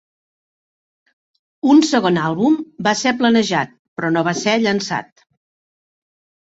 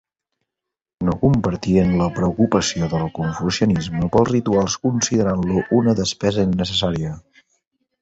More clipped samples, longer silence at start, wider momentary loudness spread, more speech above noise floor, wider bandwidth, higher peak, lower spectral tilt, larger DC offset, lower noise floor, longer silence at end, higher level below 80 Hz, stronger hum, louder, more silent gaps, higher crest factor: neither; first, 1.65 s vs 1 s; first, 10 LU vs 6 LU; first, over 74 dB vs 66 dB; about the same, 8 kHz vs 8.2 kHz; about the same, -2 dBFS vs -2 dBFS; about the same, -4.5 dB/octave vs -5.5 dB/octave; neither; first, under -90 dBFS vs -84 dBFS; first, 1.5 s vs 0.8 s; second, -60 dBFS vs -40 dBFS; neither; about the same, -17 LUFS vs -19 LUFS; first, 3.79-3.96 s vs none; about the same, 18 dB vs 18 dB